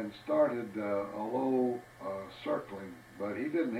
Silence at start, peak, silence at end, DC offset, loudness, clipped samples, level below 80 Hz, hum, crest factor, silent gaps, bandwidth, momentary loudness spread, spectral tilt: 0 s; -18 dBFS; 0 s; under 0.1%; -34 LUFS; under 0.1%; -72 dBFS; none; 16 dB; none; 16 kHz; 12 LU; -7 dB/octave